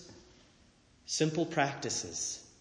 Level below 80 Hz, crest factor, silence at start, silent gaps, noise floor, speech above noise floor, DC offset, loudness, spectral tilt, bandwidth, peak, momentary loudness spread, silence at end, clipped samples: -68 dBFS; 20 dB; 0 s; none; -64 dBFS; 31 dB; under 0.1%; -33 LUFS; -3.5 dB/octave; 10.5 kHz; -16 dBFS; 13 LU; 0.15 s; under 0.1%